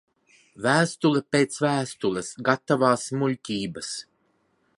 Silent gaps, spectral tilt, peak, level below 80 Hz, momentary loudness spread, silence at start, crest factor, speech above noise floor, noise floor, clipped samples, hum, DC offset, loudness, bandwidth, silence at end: none; -5 dB/octave; -4 dBFS; -66 dBFS; 9 LU; 0.6 s; 22 dB; 44 dB; -68 dBFS; under 0.1%; none; under 0.1%; -24 LUFS; 11.5 kHz; 0.75 s